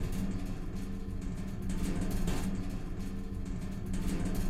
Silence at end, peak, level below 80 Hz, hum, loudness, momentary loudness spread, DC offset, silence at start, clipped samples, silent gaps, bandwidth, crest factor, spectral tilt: 0 s; -20 dBFS; -38 dBFS; none; -38 LUFS; 6 LU; under 0.1%; 0 s; under 0.1%; none; 15.5 kHz; 14 dB; -6.5 dB/octave